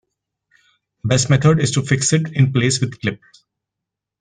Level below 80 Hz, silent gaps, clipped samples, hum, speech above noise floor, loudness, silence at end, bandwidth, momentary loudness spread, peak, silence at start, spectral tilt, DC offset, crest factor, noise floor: -50 dBFS; none; under 0.1%; none; 67 dB; -17 LUFS; 1.05 s; 10 kHz; 11 LU; -2 dBFS; 1.05 s; -5 dB/octave; under 0.1%; 18 dB; -83 dBFS